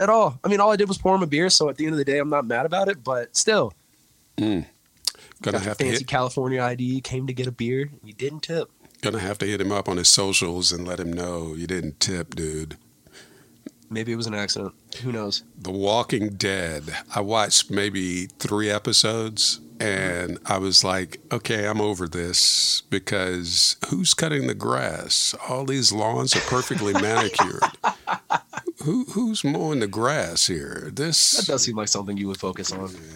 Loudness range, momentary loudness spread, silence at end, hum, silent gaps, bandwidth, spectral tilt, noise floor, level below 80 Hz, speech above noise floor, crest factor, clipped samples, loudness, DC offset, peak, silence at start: 7 LU; 12 LU; 0 s; none; none; 17 kHz; -3 dB/octave; -60 dBFS; -54 dBFS; 36 dB; 22 dB; under 0.1%; -22 LUFS; under 0.1%; -2 dBFS; 0 s